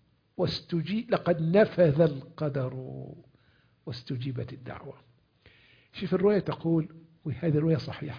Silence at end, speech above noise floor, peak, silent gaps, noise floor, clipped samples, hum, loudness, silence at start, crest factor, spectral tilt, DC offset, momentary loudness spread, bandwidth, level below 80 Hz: 0 s; 37 dB; -10 dBFS; none; -65 dBFS; under 0.1%; none; -28 LUFS; 0.4 s; 20 dB; -9 dB/octave; under 0.1%; 20 LU; 5.2 kHz; -60 dBFS